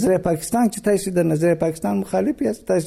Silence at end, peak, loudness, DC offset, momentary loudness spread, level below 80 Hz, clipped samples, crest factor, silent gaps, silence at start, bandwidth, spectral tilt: 0 s; -6 dBFS; -20 LUFS; under 0.1%; 4 LU; -48 dBFS; under 0.1%; 14 dB; none; 0 s; 16 kHz; -6.5 dB/octave